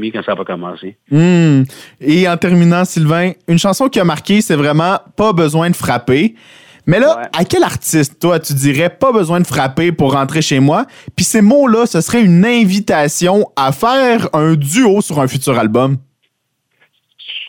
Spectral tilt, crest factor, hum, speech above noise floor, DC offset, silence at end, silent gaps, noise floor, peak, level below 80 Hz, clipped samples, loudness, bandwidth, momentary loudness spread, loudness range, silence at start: -5.5 dB/octave; 12 dB; none; 55 dB; under 0.1%; 0 s; none; -66 dBFS; 0 dBFS; -48 dBFS; under 0.1%; -12 LUFS; 17.5 kHz; 7 LU; 2 LU; 0 s